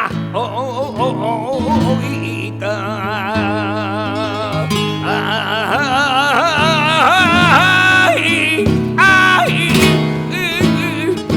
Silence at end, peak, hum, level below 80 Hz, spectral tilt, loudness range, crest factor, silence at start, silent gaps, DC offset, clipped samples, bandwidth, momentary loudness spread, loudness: 0 s; 0 dBFS; none; -42 dBFS; -4.5 dB/octave; 8 LU; 14 dB; 0 s; none; under 0.1%; under 0.1%; 19 kHz; 11 LU; -14 LUFS